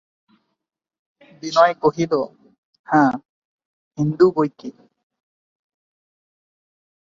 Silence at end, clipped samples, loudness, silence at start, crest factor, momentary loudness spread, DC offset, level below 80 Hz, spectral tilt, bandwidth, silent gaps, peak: 2.3 s; under 0.1%; -19 LUFS; 1.45 s; 22 dB; 18 LU; under 0.1%; -64 dBFS; -6.5 dB/octave; 7.6 kHz; 2.58-2.73 s, 2.79-2.84 s, 3.25-3.59 s, 3.65-3.91 s; -2 dBFS